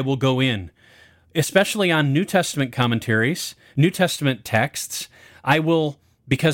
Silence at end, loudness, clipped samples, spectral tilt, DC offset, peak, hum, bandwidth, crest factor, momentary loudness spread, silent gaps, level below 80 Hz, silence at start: 0 s; -21 LUFS; under 0.1%; -5 dB/octave; under 0.1%; -4 dBFS; none; 17 kHz; 18 dB; 10 LU; none; -56 dBFS; 0 s